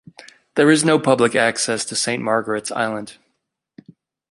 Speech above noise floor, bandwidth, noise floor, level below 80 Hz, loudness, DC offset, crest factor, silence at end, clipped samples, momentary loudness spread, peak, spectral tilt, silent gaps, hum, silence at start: 56 dB; 11.5 kHz; -74 dBFS; -64 dBFS; -18 LUFS; under 0.1%; 18 dB; 1.2 s; under 0.1%; 10 LU; -2 dBFS; -3.5 dB/octave; none; none; 0.55 s